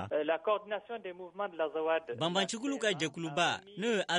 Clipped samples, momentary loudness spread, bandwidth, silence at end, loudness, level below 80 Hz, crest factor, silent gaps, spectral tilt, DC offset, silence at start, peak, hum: under 0.1%; 8 LU; 11 kHz; 0 s; -34 LUFS; -78 dBFS; 18 dB; none; -3.5 dB/octave; under 0.1%; 0 s; -16 dBFS; none